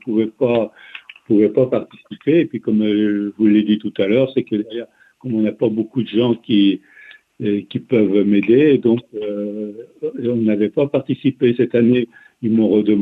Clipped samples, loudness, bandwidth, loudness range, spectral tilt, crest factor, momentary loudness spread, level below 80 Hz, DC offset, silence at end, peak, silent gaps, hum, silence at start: under 0.1%; -17 LUFS; 4.1 kHz; 2 LU; -9.5 dB/octave; 14 dB; 13 LU; -60 dBFS; under 0.1%; 0 s; -2 dBFS; none; none; 0.05 s